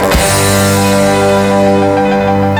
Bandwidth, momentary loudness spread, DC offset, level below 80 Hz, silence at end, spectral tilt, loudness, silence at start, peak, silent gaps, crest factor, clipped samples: 17.5 kHz; 2 LU; under 0.1%; -26 dBFS; 0 s; -4.5 dB/octave; -9 LUFS; 0 s; 0 dBFS; none; 10 dB; under 0.1%